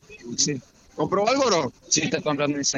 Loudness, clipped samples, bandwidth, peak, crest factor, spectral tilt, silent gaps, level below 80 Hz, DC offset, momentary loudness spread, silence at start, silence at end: -23 LUFS; under 0.1%; 9.2 kHz; -4 dBFS; 20 dB; -3 dB/octave; none; -60 dBFS; under 0.1%; 12 LU; 0.1 s; 0 s